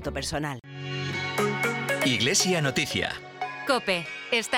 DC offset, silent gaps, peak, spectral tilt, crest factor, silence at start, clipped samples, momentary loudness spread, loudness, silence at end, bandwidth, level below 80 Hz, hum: under 0.1%; none; -10 dBFS; -3 dB/octave; 18 dB; 0 s; under 0.1%; 13 LU; -26 LUFS; 0 s; 19 kHz; -52 dBFS; none